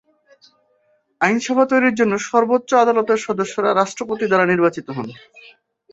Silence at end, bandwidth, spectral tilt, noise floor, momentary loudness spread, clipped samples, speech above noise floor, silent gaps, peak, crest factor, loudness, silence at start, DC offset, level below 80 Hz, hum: 0.5 s; 8.2 kHz; -5 dB/octave; -62 dBFS; 8 LU; under 0.1%; 45 dB; none; -2 dBFS; 18 dB; -17 LUFS; 1.2 s; under 0.1%; -64 dBFS; none